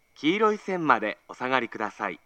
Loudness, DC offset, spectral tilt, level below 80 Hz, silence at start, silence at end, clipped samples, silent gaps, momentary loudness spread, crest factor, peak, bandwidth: -26 LUFS; under 0.1%; -5.5 dB/octave; -74 dBFS; 0.2 s; 0.1 s; under 0.1%; none; 9 LU; 22 dB; -4 dBFS; 8.8 kHz